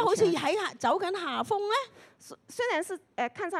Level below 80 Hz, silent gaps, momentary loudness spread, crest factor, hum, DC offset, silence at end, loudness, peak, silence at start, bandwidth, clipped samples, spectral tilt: -76 dBFS; none; 13 LU; 16 dB; none; under 0.1%; 0 s; -29 LUFS; -12 dBFS; 0 s; 13.5 kHz; under 0.1%; -3.5 dB/octave